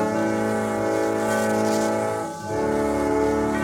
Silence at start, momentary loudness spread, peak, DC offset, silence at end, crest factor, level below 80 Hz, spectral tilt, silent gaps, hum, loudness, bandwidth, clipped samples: 0 s; 4 LU; -10 dBFS; under 0.1%; 0 s; 12 dB; -46 dBFS; -5.5 dB/octave; none; none; -23 LUFS; 18 kHz; under 0.1%